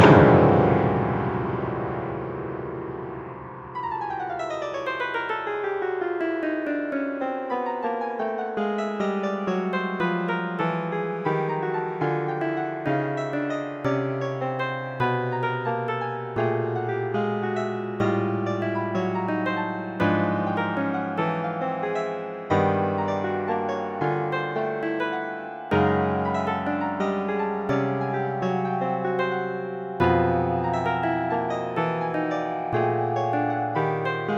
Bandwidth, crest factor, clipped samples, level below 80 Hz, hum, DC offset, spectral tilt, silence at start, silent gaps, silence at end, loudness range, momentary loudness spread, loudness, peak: 7.6 kHz; 24 dB; under 0.1%; -52 dBFS; none; under 0.1%; -8 dB/octave; 0 s; none; 0 s; 3 LU; 7 LU; -25 LUFS; -2 dBFS